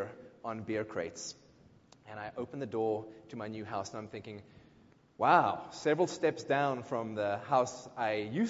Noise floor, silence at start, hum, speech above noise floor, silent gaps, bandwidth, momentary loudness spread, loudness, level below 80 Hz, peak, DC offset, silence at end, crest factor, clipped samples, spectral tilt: -63 dBFS; 0 s; none; 29 dB; none; 7.6 kHz; 16 LU; -34 LUFS; -70 dBFS; -12 dBFS; under 0.1%; 0 s; 24 dB; under 0.1%; -4.5 dB/octave